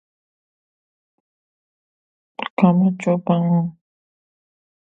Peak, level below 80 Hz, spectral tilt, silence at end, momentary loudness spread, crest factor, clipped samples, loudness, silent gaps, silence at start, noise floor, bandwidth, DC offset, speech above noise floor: -2 dBFS; -68 dBFS; -9 dB/octave; 1.15 s; 14 LU; 20 dB; under 0.1%; -19 LUFS; 2.50-2.57 s; 2.4 s; under -90 dBFS; 7.8 kHz; under 0.1%; over 73 dB